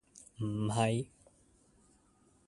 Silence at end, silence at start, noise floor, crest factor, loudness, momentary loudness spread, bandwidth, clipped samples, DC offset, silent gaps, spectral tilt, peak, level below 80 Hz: 1.45 s; 0.15 s; -68 dBFS; 24 dB; -35 LUFS; 16 LU; 11.5 kHz; under 0.1%; under 0.1%; none; -6 dB/octave; -16 dBFS; -66 dBFS